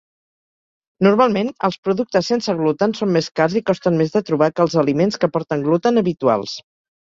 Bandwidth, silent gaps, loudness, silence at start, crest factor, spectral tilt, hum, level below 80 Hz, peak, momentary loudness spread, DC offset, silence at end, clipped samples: 7.6 kHz; 1.78-1.83 s, 3.31-3.35 s; -18 LUFS; 1 s; 16 dB; -6.5 dB/octave; none; -60 dBFS; -2 dBFS; 5 LU; under 0.1%; 0.4 s; under 0.1%